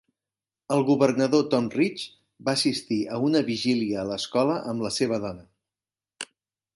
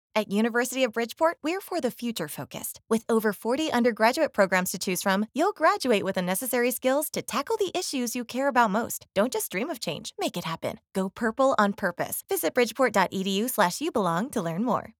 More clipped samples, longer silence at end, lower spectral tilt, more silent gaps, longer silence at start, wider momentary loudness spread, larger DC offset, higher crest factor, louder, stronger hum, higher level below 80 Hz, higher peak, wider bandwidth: neither; first, 0.5 s vs 0.15 s; about the same, -5 dB/octave vs -4 dB/octave; neither; first, 0.7 s vs 0.15 s; first, 17 LU vs 8 LU; neither; about the same, 20 dB vs 20 dB; about the same, -25 LUFS vs -26 LUFS; neither; about the same, -64 dBFS vs -68 dBFS; about the same, -6 dBFS vs -6 dBFS; second, 11.5 kHz vs over 20 kHz